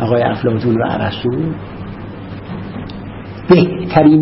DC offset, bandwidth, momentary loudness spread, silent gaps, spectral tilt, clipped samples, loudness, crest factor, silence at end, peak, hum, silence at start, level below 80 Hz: under 0.1%; 5.8 kHz; 18 LU; none; -11 dB/octave; under 0.1%; -15 LUFS; 14 dB; 0 s; 0 dBFS; none; 0 s; -40 dBFS